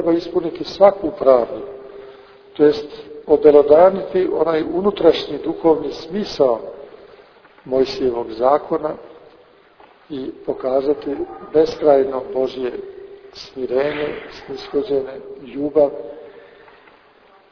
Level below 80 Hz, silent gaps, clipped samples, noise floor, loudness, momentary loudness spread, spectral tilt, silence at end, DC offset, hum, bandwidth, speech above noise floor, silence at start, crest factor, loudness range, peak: -52 dBFS; none; under 0.1%; -50 dBFS; -18 LUFS; 20 LU; -6.5 dB/octave; 1.1 s; under 0.1%; none; 5.4 kHz; 33 dB; 0 s; 18 dB; 8 LU; 0 dBFS